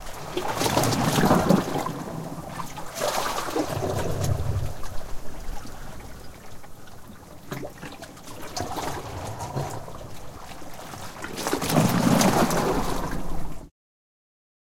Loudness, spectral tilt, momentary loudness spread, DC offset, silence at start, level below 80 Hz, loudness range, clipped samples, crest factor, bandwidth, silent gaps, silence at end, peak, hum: -26 LUFS; -5 dB/octave; 21 LU; under 0.1%; 0 s; -40 dBFS; 14 LU; under 0.1%; 22 dB; 17 kHz; none; 1 s; -6 dBFS; none